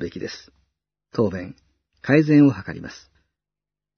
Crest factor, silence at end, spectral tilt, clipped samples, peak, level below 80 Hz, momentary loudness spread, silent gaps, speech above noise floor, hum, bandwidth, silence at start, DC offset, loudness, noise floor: 20 dB; 1.05 s; -8 dB/octave; under 0.1%; -2 dBFS; -60 dBFS; 23 LU; none; 69 dB; 50 Hz at -45 dBFS; 6.6 kHz; 0 s; under 0.1%; -19 LUFS; -89 dBFS